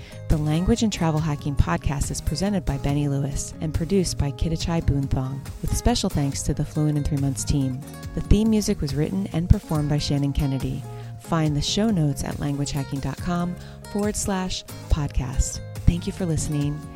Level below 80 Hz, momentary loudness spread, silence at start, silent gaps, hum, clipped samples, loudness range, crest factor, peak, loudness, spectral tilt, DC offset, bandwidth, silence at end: -30 dBFS; 7 LU; 0 s; none; none; under 0.1%; 3 LU; 22 dB; 0 dBFS; -24 LUFS; -5.5 dB/octave; under 0.1%; 16 kHz; 0 s